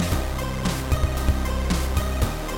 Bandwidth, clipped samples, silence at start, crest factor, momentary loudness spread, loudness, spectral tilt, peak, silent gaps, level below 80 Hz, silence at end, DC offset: 17 kHz; under 0.1%; 0 s; 16 dB; 2 LU; -25 LUFS; -5 dB/octave; -8 dBFS; none; -26 dBFS; 0 s; under 0.1%